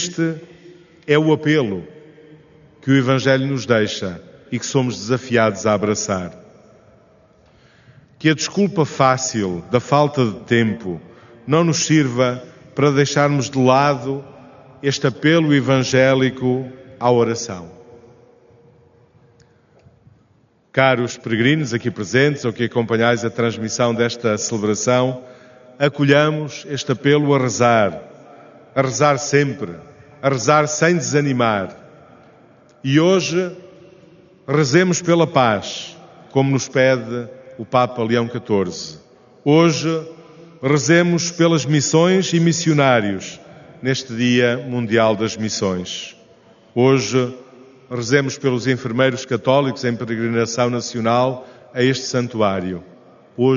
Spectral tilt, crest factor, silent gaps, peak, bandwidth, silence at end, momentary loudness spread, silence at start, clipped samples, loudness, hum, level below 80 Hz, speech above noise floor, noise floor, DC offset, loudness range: -5 dB/octave; 18 dB; none; 0 dBFS; 7.4 kHz; 0 s; 13 LU; 0 s; under 0.1%; -18 LUFS; none; -60 dBFS; 40 dB; -57 dBFS; under 0.1%; 4 LU